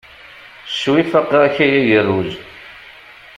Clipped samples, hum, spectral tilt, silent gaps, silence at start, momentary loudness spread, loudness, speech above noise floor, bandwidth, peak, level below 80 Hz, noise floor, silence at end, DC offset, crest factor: under 0.1%; none; -6 dB/octave; none; 0.35 s; 23 LU; -15 LUFS; 26 dB; 10.5 kHz; -2 dBFS; -54 dBFS; -40 dBFS; 0.45 s; under 0.1%; 16 dB